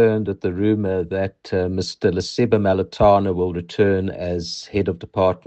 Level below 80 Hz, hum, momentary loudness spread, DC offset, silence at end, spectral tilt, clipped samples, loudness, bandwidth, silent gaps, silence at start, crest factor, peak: -46 dBFS; none; 8 LU; under 0.1%; 0.1 s; -6.5 dB/octave; under 0.1%; -20 LUFS; 8.6 kHz; none; 0 s; 16 dB; -4 dBFS